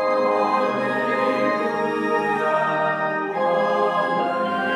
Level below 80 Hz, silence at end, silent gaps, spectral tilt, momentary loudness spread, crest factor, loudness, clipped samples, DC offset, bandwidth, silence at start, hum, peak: -74 dBFS; 0 s; none; -6 dB/octave; 3 LU; 12 dB; -21 LUFS; under 0.1%; under 0.1%; 12 kHz; 0 s; none; -8 dBFS